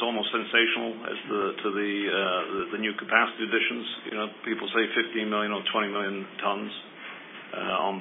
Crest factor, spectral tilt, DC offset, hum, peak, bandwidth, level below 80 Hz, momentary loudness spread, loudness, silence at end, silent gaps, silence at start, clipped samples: 24 dB; -7.5 dB/octave; under 0.1%; none; -4 dBFS; 4 kHz; -76 dBFS; 11 LU; -27 LUFS; 0 s; none; 0 s; under 0.1%